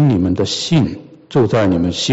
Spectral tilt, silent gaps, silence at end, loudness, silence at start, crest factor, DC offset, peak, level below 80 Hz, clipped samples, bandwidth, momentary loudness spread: -6 dB/octave; none; 0 s; -16 LUFS; 0 s; 12 dB; under 0.1%; -4 dBFS; -42 dBFS; under 0.1%; 8.2 kHz; 7 LU